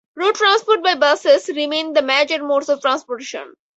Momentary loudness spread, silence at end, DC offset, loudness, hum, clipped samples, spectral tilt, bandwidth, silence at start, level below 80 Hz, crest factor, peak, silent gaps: 12 LU; 0.3 s; under 0.1%; -16 LUFS; none; under 0.1%; -0.5 dB/octave; 8.2 kHz; 0.15 s; -72 dBFS; 16 dB; -2 dBFS; none